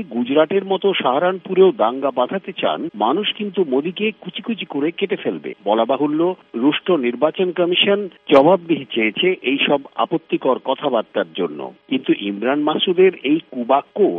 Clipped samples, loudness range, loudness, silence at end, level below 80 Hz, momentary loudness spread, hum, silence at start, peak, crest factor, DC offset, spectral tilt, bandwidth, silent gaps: under 0.1%; 4 LU; -18 LUFS; 0 s; -70 dBFS; 8 LU; none; 0 s; 0 dBFS; 18 dB; under 0.1%; -8 dB/octave; 4.4 kHz; none